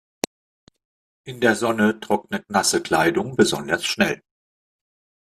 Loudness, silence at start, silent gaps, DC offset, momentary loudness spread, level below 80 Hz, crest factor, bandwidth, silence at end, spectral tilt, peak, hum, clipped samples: -21 LUFS; 1.25 s; none; under 0.1%; 12 LU; -60 dBFS; 22 dB; 15 kHz; 1.15 s; -3.5 dB/octave; 0 dBFS; none; under 0.1%